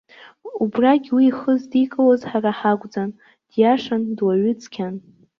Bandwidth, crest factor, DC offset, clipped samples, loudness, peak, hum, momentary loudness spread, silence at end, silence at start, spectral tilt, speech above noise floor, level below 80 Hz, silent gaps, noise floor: 6.8 kHz; 16 dB; under 0.1%; under 0.1%; -20 LUFS; -4 dBFS; none; 12 LU; 0.4 s; 0.45 s; -7.5 dB/octave; 21 dB; -66 dBFS; none; -40 dBFS